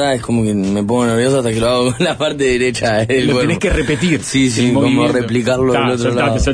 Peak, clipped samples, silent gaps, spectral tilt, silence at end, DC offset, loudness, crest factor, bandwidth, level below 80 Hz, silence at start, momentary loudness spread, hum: -2 dBFS; under 0.1%; none; -5 dB/octave; 0 s; under 0.1%; -14 LUFS; 12 dB; 10.5 kHz; -30 dBFS; 0 s; 3 LU; none